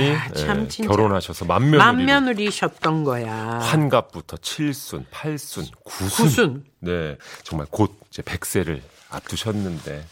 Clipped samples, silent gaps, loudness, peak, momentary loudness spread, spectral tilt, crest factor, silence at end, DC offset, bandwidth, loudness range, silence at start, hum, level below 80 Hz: under 0.1%; none; -21 LUFS; 0 dBFS; 15 LU; -5 dB/octave; 22 dB; 0.05 s; under 0.1%; 16.5 kHz; 7 LU; 0 s; none; -46 dBFS